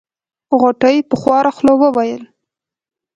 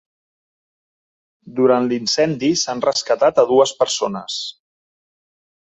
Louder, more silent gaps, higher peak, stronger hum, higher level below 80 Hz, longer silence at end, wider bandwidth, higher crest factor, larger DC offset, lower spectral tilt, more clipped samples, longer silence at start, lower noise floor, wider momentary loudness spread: first, -13 LUFS vs -17 LUFS; neither; about the same, 0 dBFS vs -2 dBFS; neither; first, -56 dBFS vs -62 dBFS; second, 0.9 s vs 1.15 s; about the same, 8 kHz vs 8.4 kHz; about the same, 14 dB vs 18 dB; neither; first, -6.5 dB/octave vs -3.5 dB/octave; neither; second, 0.5 s vs 1.45 s; about the same, -87 dBFS vs under -90 dBFS; second, 7 LU vs 11 LU